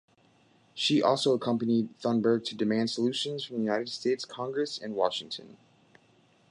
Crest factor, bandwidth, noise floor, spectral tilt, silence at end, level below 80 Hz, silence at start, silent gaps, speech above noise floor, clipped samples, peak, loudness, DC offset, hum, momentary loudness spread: 18 dB; 11 kHz; -64 dBFS; -5 dB/octave; 1 s; -76 dBFS; 0.75 s; none; 35 dB; under 0.1%; -12 dBFS; -29 LUFS; under 0.1%; none; 8 LU